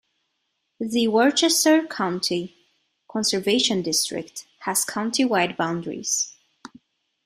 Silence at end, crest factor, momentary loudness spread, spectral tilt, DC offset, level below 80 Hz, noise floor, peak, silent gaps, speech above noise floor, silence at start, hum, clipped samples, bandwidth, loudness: 0.95 s; 18 dB; 13 LU; -2.5 dB/octave; under 0.1%; -68 dBFS; -75 dBFS; -6 dBFS; none; 53 dB; 0.8 s; none; under 0.1%; 15.5 kHz; -22 LUFS